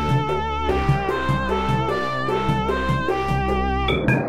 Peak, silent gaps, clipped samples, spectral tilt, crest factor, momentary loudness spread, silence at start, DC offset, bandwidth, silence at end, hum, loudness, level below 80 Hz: -4 dBFS; none; under 0.1%; -7 dB/octave; 16 dB; 2 LU; 0 s; 2%; 13.5 kHz; 0 s; none; -22 LUFS; -32 dBFS